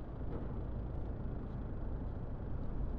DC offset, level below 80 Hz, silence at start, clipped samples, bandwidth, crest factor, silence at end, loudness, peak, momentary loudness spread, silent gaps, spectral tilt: under 0.1%; -42 dBFS; 0 s; under 0.1%; 4.3 kHz; 12 dB; 0 s; -44 LUFS; -28 dBFS; 1 LU; none; -10 dB/octave